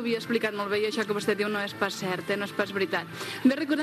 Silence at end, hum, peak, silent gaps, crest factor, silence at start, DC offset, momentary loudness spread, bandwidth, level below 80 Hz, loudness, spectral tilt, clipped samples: 0 s; none; -10 dBFS; none; 18 dB; 0 s; under 0.1%; 4 LU; 14 kHz; -74 dBFS; -28 LUFS; -4.5 dB/octave; under 0.1%